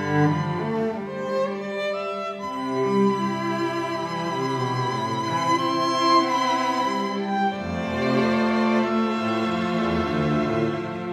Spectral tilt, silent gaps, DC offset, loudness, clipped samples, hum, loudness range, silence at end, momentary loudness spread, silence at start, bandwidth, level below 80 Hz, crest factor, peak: -6 dB/octave; none; under 0.1%; -24 LUFS; under 0.1%; none; 3 LU; 0 s; 6 LU; 0 s; 13 kHz; -54 dBFS; 16 dB; -8 dBFS